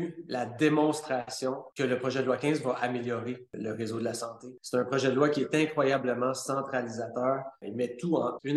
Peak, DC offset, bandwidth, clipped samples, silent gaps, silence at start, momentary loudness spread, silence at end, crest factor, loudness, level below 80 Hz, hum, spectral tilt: -12 dBFS; under 0.1%; 12.5 kHz; under 0.1%; none; 0 s; 9 LU; 0 s; 18 dB; -30 LUFS; -76 dBFS; none; -5.5 dB/octave